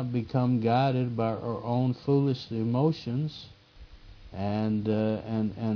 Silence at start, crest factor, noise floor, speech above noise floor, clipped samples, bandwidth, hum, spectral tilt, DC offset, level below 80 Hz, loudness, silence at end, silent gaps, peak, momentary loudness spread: 0 s; 16 dB; -50 dBFS; 23 dB; under 0.1%; 5.4 kHz; none; -9.5 dB/octave; under 0.1%; -56 dBFS; -28 LUFS; 0 s; none; -12 dBFS; 8 LU